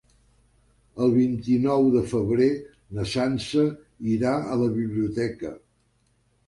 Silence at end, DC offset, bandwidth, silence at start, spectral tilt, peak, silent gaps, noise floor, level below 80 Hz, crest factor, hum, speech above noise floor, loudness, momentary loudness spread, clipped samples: 0.9 s; under 0.1%; 11.5 kHz; 0.95 s; -7 dB/octave; -10 dBFS; none; -66 dBFS; -52 dBFS; 16 dB; 50 Hz at -50 dBFS; 43 dB; -24 LUFS; 12 LU; under 0.1%